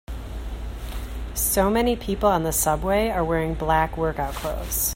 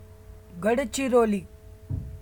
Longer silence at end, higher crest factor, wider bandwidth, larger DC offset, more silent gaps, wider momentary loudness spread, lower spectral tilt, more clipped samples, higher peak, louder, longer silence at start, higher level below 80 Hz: about the same, 0 s vs 0 s; about the same, 16 dB vs 18 dB; second, 16.5 kHz vs 19.5 kHz; neither; neither; about the same, 14 LU vs 14 LU; about the same, -4.5 dB/octave vs -5.5 dB/octave; neither; first, -6 dBFS vs -10 dBFS; first, -23 LUFS vs -26 LUFS; about the same, 0.1 s vs 0 s; first, -32 dBFS vs -46 dBFS